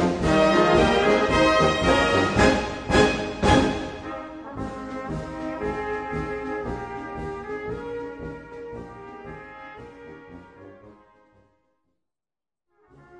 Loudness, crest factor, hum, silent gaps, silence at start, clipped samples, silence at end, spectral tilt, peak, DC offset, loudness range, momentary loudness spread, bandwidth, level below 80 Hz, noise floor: -22 LUFS; 20 dB; none; none; 0 s; under 0.1%; 0 s; -5 dB/octave; -4 dBFS; under 0.1%; 22 LU; 21 LU; 10.5 kHz; -40 dBFS; under -90 dBFS